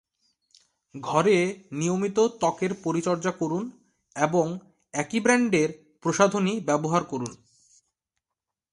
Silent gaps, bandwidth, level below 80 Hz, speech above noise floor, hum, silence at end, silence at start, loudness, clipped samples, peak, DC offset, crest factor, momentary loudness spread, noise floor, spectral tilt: none; 11.5 kHz; -68 dBFS; 63 dB; none; 1.35 s; 0.95 s; -25 LUFS; under 0.1%; -4 dBFS; under 0.1%; 22 dB; 12 LU; -87 dBFS; -5 dB/octave